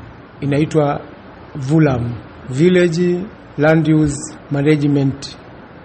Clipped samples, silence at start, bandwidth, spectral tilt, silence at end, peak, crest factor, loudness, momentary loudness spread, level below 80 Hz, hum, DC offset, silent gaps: under 0.1%; 0 s; 8.8 kHz; -7 dB/octave; 0 s; 0 dBFS; 16 dB; -16 LUFS; 16 LU; -44 dBFS; none; under 0.1%; none